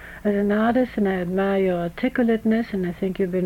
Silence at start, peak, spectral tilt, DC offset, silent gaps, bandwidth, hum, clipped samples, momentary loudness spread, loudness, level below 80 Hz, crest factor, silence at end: 0 s; -8 dBFS; -8.5 dB/octave; under 0.1%; none; 16 kHz; none; under 0.1%; 5 LU; -22 LUFS; -48 dBFS; 12 dB; 0 s